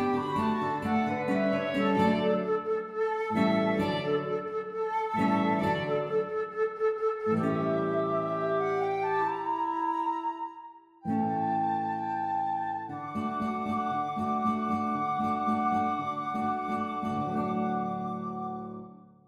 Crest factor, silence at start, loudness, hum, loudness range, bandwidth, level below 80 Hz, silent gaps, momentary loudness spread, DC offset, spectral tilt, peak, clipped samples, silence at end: 16 dB; 0 s; -30 LUFS; none; 3 LU; 12 kHz; -66 dBFS; none; 7 LU; under 0.1%; -7.5 dB/octave; -12 dBFS; under 0.1%; 0.3 s